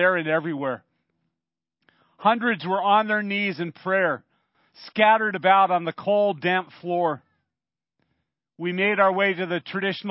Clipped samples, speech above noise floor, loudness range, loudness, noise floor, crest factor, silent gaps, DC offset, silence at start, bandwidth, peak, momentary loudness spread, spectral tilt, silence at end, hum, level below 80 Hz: under 0.1%; 67 dB; 4 LU; -22 LUFS; -90 dBFS; 20 dB; none; under 0.1%; 0 s; 5.8 kHz; -4 dBFS; 11 LU; -9.5 dB/octave; 0 s; none; -78 dBFS